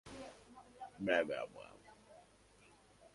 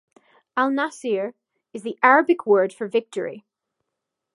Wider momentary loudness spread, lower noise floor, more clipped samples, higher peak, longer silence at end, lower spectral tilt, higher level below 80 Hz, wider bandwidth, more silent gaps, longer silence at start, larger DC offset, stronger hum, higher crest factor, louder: first, 26 LU vs 17 LU; second, -66 dBFS vs -82 dBFS; neither; second, -20 dBFS vs -2 dBFS; second, 0.05 s vs 0.95 s; about the same, -4.5 dB/octave vs -5 dB/octave; first, -74 dBFS vs -82 dBFS; about the same, 11.5 kHz vs 11.5 kHz; neither; second, 0.05 s vs 0.55 s; neither; neither; about the same, 24 dB vs 22 dB; second, -39 LUFS vs -21 LUFS